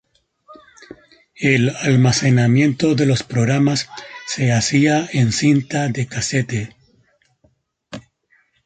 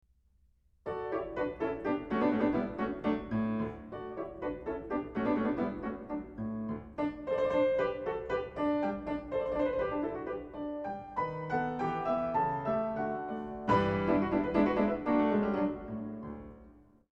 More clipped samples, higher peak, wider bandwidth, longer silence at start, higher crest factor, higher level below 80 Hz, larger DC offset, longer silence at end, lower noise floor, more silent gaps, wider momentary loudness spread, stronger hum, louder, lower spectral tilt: neither; first, -2 dBFS vs -14 dBFS; first, 9.4 kHz vs 7.4 kHz; second, 0.5 s vs 0.85 s; about the same, 16 dB vs 20 dB; first, -50 dBFS vs -56 dBFS; neither; first, 0.65 s vs 0.4 s; second, -61 dBFS vs -68 dBFS; neither; first, 16 LU vs 11 LU; neither; first, -17 LUFS vs -33 LUFS; second, -5.5 dB/octave vs -8.5 dB/octave